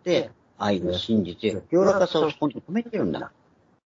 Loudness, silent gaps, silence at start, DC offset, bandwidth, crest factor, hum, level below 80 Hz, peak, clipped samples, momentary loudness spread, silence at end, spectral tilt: -25 LUFS; none; 0.05 s; under 0.1%; 7.8 kHz; 18 dB; none; -60 dBFS; -6 dBFS; under 0.1%; 9 LU; 0.6 s; -6 dB/octave